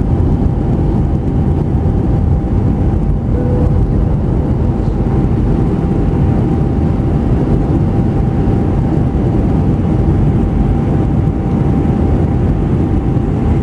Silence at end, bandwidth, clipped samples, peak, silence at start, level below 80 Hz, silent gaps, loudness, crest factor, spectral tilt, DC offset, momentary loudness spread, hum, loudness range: 0 s; 6.4 kHz; under 0.1%; -2 dBFS; 0 s; -18 dBFS; none; -14 LUFS; 10 dB; -10.5 dB/octave; under 0.1%; 2 LU; none; 1 LU